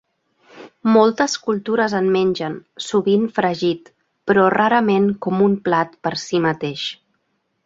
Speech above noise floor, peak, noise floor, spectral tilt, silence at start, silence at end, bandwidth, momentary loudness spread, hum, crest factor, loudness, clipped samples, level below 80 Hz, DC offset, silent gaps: 52 dB; -2 dBFS; -70 dBFS; -5.5 dB/octave; 0.55 s; 0.75 s; 7.8 kHz; 11 LU; none; 16 dB; -18 LUFS; under 0.1%; -60 dBFS; under 0.1%; none